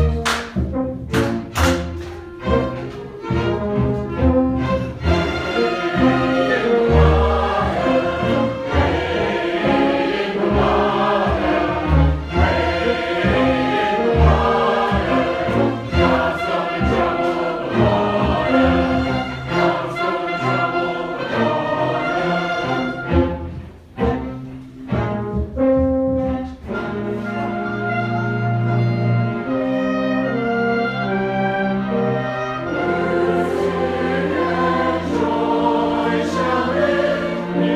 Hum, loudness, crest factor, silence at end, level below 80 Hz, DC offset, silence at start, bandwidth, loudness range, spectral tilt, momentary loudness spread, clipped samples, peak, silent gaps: none; -19 LUFS; 18 dB; 0 s; -30 dBFS; under 0.1%; 0 s; 14.5 kHz; 4 LU; -7 dB/octave; 7 LU; under 0.1%; -2 dBFS; none